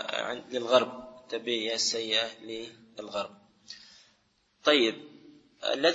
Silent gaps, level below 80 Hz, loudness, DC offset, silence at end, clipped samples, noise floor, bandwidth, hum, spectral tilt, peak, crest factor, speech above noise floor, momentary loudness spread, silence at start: none; -74 dBFS; -29 LUFS; under 0.1%; 0 s; under 0.1%; -70 dBFS; 8 kHz; none; -2 dB/octave; -6 dBFS; 24 dB; 41 dB; 21 LU; 0 s